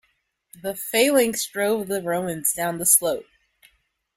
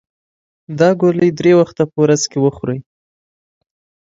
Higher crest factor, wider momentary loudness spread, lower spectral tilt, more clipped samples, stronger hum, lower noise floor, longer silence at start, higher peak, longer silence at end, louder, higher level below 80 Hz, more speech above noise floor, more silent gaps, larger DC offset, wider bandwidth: first, 22 dB vs 16 dB; about the same, 14 LU vs 12 LU; second, -2.5 dB/octave vs -6 dB/octave; neither; neither; second, -70 dBFS vs under -90 dBFS; second, 0.55 s vs 0.7 s; about the same, -2 dBFS vs 0 dBFS; second, 0.95 s vs 1.25 s; second, -21 LUFS vs -14 LUFS; second, -62 dBFS vs -54 dBFS; second, 47 dB vs over 76 dB; neither; neither; first, 16 kHz vs 7.8 kHz